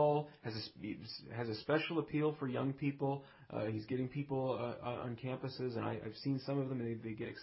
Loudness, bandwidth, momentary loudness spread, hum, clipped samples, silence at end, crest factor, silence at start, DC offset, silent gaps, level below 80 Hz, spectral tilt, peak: -40 LUFS; 5.8 kHz; 9 LU; none; under 0.1%; 0 s; 18 dB; 0 s; under 0.1%; none; -70 dBFS; -10 dB/octave; -20 dBFS